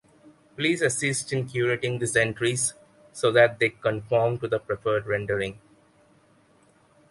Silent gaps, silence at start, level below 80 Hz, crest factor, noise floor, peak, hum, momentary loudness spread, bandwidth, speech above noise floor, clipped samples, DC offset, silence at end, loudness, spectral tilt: none; 0.25 s; -58 dBFS; 22 dB; -60 dBFS; -4 dBFS; none; 8 LU; 11.5 kHz; 35 dB; under 0.1%; under 0.1%; 1.55 s; -25 LUFS; -4 dB/octave